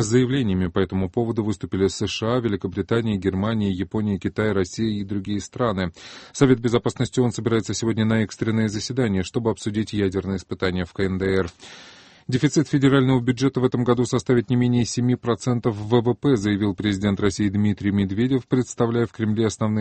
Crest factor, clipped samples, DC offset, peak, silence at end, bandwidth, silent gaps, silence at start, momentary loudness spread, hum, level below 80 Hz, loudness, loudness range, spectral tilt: 20 dB; under 0.1%; under 0.1%; -2 dBFS; 0 s; 8.8 kHz; none; 0 s; 6 LU; none; -50 dBFS; -22 LUFS; 4 LU; -6.5 dB/octave